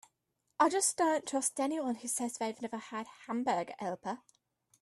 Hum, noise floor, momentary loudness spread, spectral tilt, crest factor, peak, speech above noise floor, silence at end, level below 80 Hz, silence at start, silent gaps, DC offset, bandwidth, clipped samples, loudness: none; -82 dBFS; 14 LU; -2.5 dB/octave; 20 dB; -14 dBFS; 48 dB; 0.65 s; -82 dBFS; 0.6 s; none; under 0.1%; 15 kHz; under 0.1%; -34 LUFS